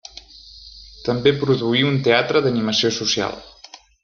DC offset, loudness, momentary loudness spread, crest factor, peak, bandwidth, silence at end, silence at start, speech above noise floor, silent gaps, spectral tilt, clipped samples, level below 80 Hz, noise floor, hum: under 0.1%; -19 LUFS; 23 LU; 18 dB; -2 dBFS; 7.2 kHz; 0.25 s; 0.35 s; 27 dB; none; -4.5 dB/octave; under 0.1%; -52 dBFS; -45 dBFS; none